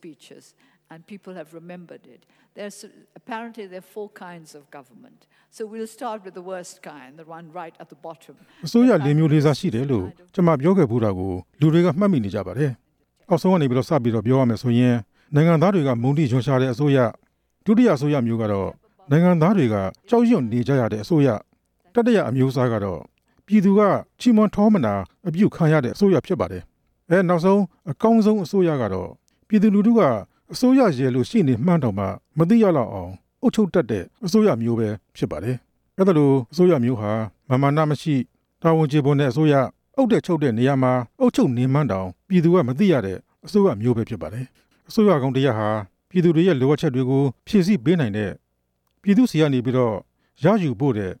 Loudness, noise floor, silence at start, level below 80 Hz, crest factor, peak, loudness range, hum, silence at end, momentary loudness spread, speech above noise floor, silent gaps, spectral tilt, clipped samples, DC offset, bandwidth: -20 LUFS; -71 dBFS; 0.05 s; -56 dBFS; 16 dB; -4 dBFS; 16 LU; none; 0.05 s; 18 LU; 52 dB; none; -8 dB/octave; under 0.1%; under 0.1%; 15 kHz